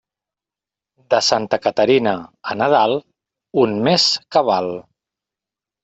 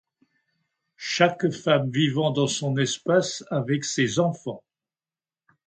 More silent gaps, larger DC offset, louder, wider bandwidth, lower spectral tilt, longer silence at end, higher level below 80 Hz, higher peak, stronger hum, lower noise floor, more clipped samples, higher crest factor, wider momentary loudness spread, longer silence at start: neither; neither; first, -17 LUFS vs -24 LUFS; second, 8.2 kHz vs 9.4 kHz; about the same, -4 dB/octave vs -4.5 dB/octave; about the same, 1.05 s vs 1.1 s; first, -60 dBFS vs -68 dBFS; first, 0 dBFS vs -4 dBFS; neither; about the same, -89 dBFS vs under -90 dBFS; neither; about the same, 18 dB vs 22 dB; about the same, 11 LU vs 9 LU; about the same, 1.1 s vs 1 s